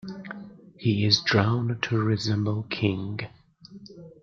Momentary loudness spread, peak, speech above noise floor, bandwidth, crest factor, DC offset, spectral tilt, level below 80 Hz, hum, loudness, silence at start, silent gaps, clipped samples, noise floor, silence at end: 21 LU; -6 dBFS; 24 dB; 7.4 kHz; 20 dB; under 0.1%; -5.5 dB/octave; -62 dBFS; none; -25 LUFS; 0.05 s; none; under 0.1%; -48 dBFS; 0.1 s